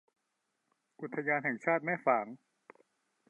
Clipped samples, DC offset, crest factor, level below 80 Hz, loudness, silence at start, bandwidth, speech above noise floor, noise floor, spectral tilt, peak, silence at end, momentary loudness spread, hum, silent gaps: under 0.1%; under 0.1%; 22 dB; under -90 dBFS; -33 LUFS; 1 s; 8.6 kHz; 50 dB; -83 dBFS; -8.5 dB/octave; -14 dBFS; 0.95 s; 16 LU; none; none